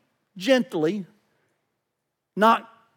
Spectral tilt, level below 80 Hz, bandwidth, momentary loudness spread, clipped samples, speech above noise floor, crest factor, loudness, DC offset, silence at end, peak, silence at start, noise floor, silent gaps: -5 dB/octave; under -90 dBFS; 18.5 kHz; 13 LU; under 0.1%; 59 dB; 22 dB; -22 LUFS; under 0.1%; 0.35 s; -4 dBFS; 0.35 s; -80 dBFS; none